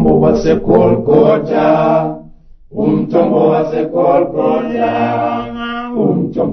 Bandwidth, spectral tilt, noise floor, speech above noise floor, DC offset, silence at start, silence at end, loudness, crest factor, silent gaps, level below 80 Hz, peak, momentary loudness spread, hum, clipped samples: 6.4 kHz; -8.5 dB/octave; -38 dBFS; 26 dB; under 0.1%; 0 s; 0 s; -13 LUFS; 12 dB; none; -36 dBFS; 0 dBFS; 9 LU; none; under 0.1%